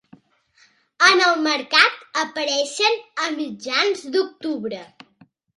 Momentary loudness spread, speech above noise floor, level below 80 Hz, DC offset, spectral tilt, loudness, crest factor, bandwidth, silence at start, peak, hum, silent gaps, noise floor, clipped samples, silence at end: 13 LU; 38 dB; -74 dBFS; under 0.1%; -1 dB/octave; -19 LUFS; 22 dB; 11.5 kHz; 1 s; 0 dBFS; none; none; -58 dBFS; under 0.1%; 0.7 s